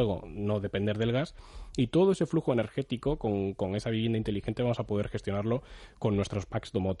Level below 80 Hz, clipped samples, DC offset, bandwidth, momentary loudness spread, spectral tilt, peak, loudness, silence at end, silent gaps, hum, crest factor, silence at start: -50 dBFS; under 0.1%; under 0.1%; 11 kHz; 8 LU; -7.5 dB/octave; -14 dBFS; -31 LUFS; 0 s; none; none; 16 dB; 0 s